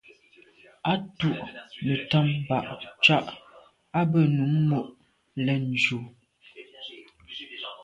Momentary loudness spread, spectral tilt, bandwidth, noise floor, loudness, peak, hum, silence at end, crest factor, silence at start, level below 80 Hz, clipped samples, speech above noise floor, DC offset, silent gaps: 20 LU; -6.5 dB/octave; 8 kHz; -57 dBFS; -25 LUFS; -6 dBFS; none; 0 s; 22 dB; 0.85 s; -64 dBFS; under 0.1%; 32 dB; under 0.1%; none